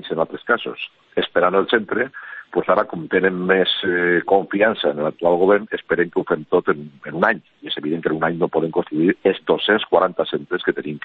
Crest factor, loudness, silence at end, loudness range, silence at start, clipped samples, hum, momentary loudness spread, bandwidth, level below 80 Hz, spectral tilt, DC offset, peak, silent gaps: 18 dB; -19 LUFS; 0 s; 3 LU; 0 s; under 0.1%; none; 8 LU; 4.7 kHz; -60 dBFS; -8.5 dB/octave; under 0.1%; -2 dBFS; none